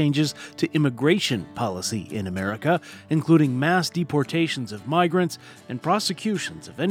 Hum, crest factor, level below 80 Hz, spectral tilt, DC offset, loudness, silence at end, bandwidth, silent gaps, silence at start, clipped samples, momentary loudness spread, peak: none; 18 dB; -64 dBFS; -5.5 dB/octave; under 0.1%; -24 LUFS; 0 s; 16.5 kHz; none; 0 s; under 0.1%; 9 LU; -6 dBFS